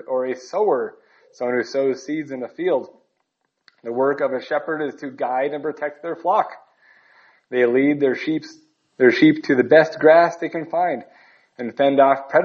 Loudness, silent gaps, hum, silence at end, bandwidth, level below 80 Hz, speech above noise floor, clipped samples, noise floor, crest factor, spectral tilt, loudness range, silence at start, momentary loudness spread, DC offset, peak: -20 LUFS; none; none; 0 s; 7.2 kHz; -74 dBFS; 54 dB; under 0.1%; -73 dBFS; 18 dB; -6 dB/octave; 8 LU; 0.1 s; 14 LU; under 0.1%; -2 dBFS